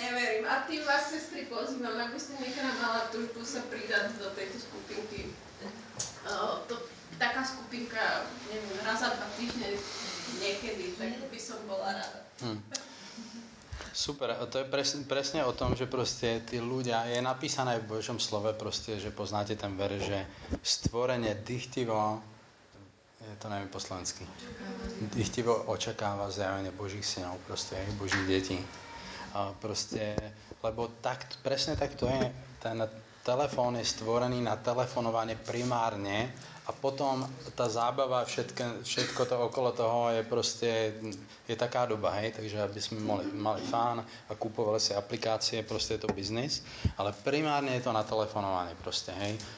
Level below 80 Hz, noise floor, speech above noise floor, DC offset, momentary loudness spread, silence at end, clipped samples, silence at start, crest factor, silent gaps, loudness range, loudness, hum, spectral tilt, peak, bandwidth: -56 dBFS; -57 dBFS; 24 dB; under 0.1%; 10 LU; 0 s; under 0.1%; 0 s; 18 dB; none; 5 LU; -34 LUFS; none; -4 dB/octave; -16 dBFS; 8 kHz